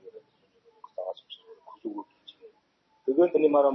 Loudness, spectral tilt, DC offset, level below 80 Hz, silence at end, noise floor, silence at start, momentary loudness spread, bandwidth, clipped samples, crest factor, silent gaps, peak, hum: -27 LUFS; -8.5 dB/octave; under 0.1%; -90 dBFS; 0 s; -69 dBFS; 0.15 s; 26 LU; 5.6 kHz; under 0.1%; 18 dB; none; -10 dBFS; none